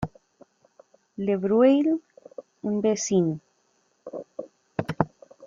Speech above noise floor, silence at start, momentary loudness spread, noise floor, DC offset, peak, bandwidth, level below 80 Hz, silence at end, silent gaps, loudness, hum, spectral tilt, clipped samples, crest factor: 46 dB; 0 s; 25 LU; -68 dBFS; under 0.1%; -2 dBFS; 7.6 kHz; -60 dBFS; 0 s; none; -25 LUFS; none; -6 dB/octave; under 0.1%; 24 dB